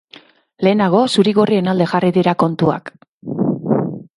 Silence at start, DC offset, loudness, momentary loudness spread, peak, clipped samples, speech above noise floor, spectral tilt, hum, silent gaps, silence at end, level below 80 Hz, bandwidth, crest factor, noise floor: 0.6 s; under 0.1%; -16 LUFS; 7 LU; 0 dBFS; under 0.1%; 31 dB; -7 dB/octave; none; 3.08-3.21 s; 0.15 s; -58 dBFS; 11.5 kHz; 16 dB; -45 dBFS